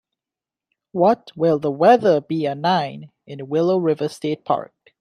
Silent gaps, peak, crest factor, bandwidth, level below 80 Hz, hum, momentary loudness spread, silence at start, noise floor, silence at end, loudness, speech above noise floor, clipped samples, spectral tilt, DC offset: none; -2 dBFS; 18 dB; 12 kHz; -68 dBFS; none; 15 LU; 0.95 s; -89 dBFS; 0.35 s; -19 LUFS; 70 dB; under 0.1%; -7 dB/octave; under 0.1%